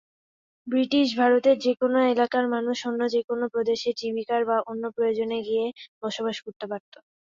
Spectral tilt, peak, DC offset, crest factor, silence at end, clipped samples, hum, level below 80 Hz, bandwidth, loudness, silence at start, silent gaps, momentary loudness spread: -4.5 dB/octave; -8 dBFS; under 0.1%; 16 dB; 0.5 s; under 0.1%; none; -70 dBFS; 7.6 kHz; -25 LUFS; 0.65 s; 3.24-3.28 s, 5.88-6.01 s, 6.56-6.60 s; 13 LU